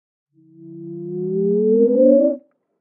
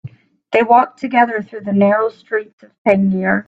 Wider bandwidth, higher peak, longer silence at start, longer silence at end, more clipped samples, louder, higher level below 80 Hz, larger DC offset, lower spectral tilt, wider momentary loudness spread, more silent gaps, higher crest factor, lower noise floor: second, 1.7 kHz vs 7.6 kHz; about the same, -2 dBFS vs 0 dBFS; first, 0.6 s vs 0.05 s; first, 0.4 s vs 0.05 s; neither; about the same, -16 LUFS vs -16 LUFS; second, -74 dBFS vs -58 dBFS; neither; first, -15 dB/octave vs -8.5 dB/octave; first, 19 LU vs 10 LU; second, none vs 2.53-2.58 s, 2.78-2.85 s; about the same, 16 dB vs 16 dB; first, -42 dBFS vs -37 dBFS